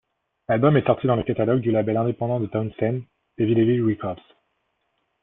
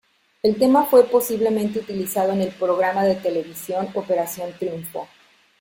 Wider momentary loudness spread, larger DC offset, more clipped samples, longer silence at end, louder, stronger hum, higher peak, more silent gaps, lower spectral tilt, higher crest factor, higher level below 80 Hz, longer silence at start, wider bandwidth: about the same, 11 LU vs 13 LU; neither; neither; first, 1.1 s vs 0.55 s; about the same, -22 LUFS vs -21 LUFS; neither; about the same, -4 dBFS vs -2 dBFS; neither; first, -12.5 dB/octave vs -5.5 dB/octave; about the same, 18 dB vs 18 dB; first, -56 dBFS vs -62 dBFS; about the same, 0.5 s vs 0.45 s; second, 3.9 kHz vs 17 kHz